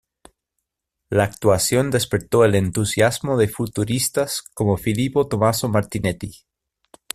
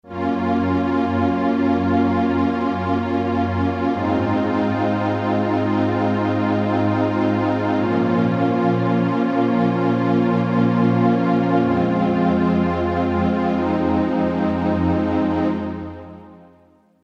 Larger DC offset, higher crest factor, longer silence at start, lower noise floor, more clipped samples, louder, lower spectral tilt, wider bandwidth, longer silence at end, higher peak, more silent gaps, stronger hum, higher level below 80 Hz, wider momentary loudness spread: neither; about the same, 18 dB vs 14 dB; first, 1.1 s vs 0.05 s; first, -80 dBFS vs -54 dBFS; neither; about the same, -20 LUFS vs -19 LUFS; second, -5 dB/octave vs -9 dB/octave; first, 15 kHz vs 7 kHz; first, 0.8 s vs 0.65 s; first, -2 dBFS vs -6 dBFS; neither; neither; about the same, -48 dBFS vs -46 dBFS; first, 8 LU vs 3 LU